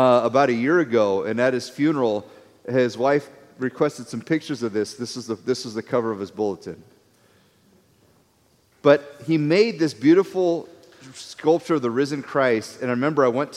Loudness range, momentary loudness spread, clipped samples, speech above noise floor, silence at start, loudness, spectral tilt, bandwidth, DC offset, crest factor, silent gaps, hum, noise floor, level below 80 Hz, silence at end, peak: 8 LU; 12 LU; under 0.1%; 40 dB; 0 s; -22 LUFS; -6 dB/octave; 13 kHz; under 0.1%; 20 dB; none; none; -61 dBFS; -70 dBFS; 0 s; -4 dBFS